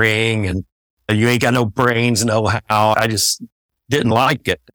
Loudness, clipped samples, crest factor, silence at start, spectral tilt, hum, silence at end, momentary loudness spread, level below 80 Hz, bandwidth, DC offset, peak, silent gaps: -16 LUFS; under 0.1%; 16 dB; 0 s; -4.5 dB/octave; none; 0.2 s; 7 LU; -46 dBFS; over 20 kHz; under 0.1%; -2 dBFS; 0.72-0.97 s, 3.52-3.69 s